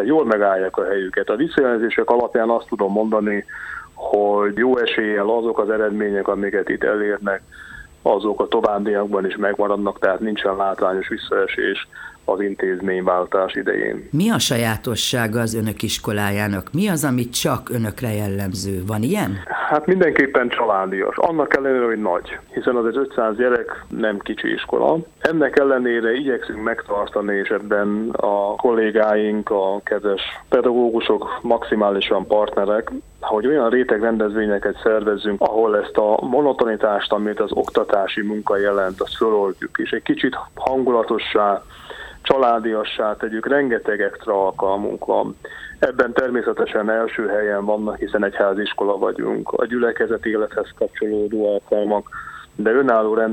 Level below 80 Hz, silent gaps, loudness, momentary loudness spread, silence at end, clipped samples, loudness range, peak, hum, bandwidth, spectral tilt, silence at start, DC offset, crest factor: -50 dBFS; none; -20 LUFS; 7 LU; 0 s; under 0.1%; 2 LU; -2 dBFS; none; 18 kHz; -5 dB/octave; 0 s; under 0.1%; 18 dB